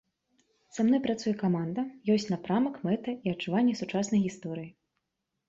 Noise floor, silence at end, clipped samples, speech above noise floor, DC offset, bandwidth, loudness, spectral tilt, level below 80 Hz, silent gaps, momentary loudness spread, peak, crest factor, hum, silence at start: -83 dBFS; 0.8 s; under 0.1%; 55 dB; under 0.1%; 7.8 kHz; -30 LUFS; -6.5 dB/octave; -68 dBFS; none; 11 LU; -16 dBFS; 14 dB; none; 0.75 s